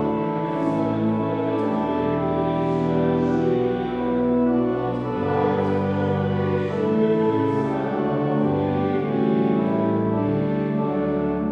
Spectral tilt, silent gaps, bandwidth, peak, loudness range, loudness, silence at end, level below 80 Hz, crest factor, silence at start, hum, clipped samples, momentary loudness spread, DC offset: -9.5 dB/octave; none; 7.2 kHz; -10 dBFS; 1 LU; -22 LUFS; 0 s; -50 dBFS; 12 dB; 0 s; none; under 0.1%; 3 LU; under 0.1%